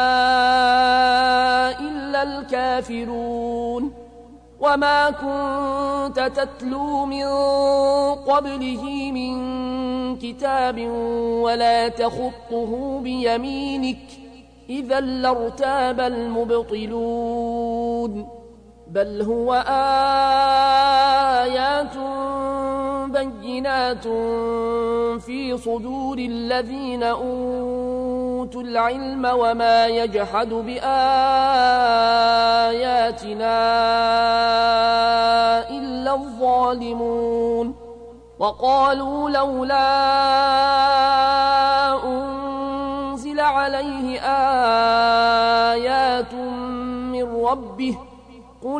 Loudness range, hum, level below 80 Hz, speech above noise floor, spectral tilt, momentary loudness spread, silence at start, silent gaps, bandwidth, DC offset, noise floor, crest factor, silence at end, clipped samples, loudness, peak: 7 LU; 60 Hz at -45 dBFS; -46 dBFS; 25 dB; -4.5 dB/octave; 10 LU; 0 s; none; 10.5 kHz; under 0.1%; -45 dBFS; 14 dB; 0 s; under 0.1%; -20 LUFS; -6 dBFS